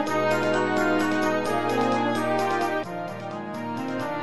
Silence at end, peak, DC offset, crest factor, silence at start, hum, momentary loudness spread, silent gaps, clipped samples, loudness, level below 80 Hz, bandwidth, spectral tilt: 0 s; -10 dBFS; 0.8%; 14 dB; 0 s; none; 10 LU; none; under 0.1%; -25 LUFS; -58 dBFS; 11.5 kHz; -5 dB/octave